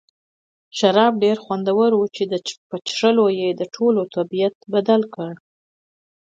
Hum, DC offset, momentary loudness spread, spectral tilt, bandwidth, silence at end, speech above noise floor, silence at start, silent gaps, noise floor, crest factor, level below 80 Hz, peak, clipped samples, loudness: none; under 0.1%; 12 LU; -5.5 dB/octave; 7.8 kHz; 0.9 s; over 71 dB; 0.75 s; 2.58-2.70 s, 4.55-4.61 s; under -90 dBFS; 18 dB; -72 dBFS; -2 dBFS; under 0.1%; -19 LUFS